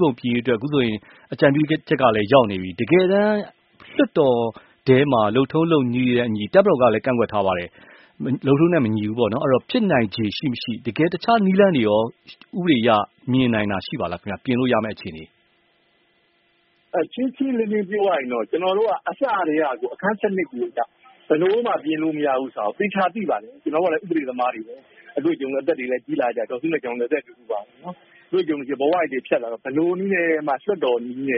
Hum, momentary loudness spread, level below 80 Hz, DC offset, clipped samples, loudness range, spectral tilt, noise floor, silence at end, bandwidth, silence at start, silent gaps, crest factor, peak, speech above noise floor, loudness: none; 10 LU; -58 dBFS; under 0.1%; under 0.1%; 6 LU; -5 dB/octave; -63 dBFS; 0 s; 5.6 kHz; 0 s; none; 20 dB; 0 dBFS; 43 dB; -21 LUFS